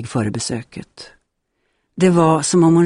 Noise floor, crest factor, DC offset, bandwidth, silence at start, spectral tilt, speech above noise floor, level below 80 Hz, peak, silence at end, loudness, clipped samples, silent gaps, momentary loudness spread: -70 dBFS; 16 dB; under 0.1%; 11 kHz; 0 s; -6 dB/octave; 54 dB; -54 dBFS; -2 dBFS; 0 s; -16 LUFS; under 0.1%; none; 23 LU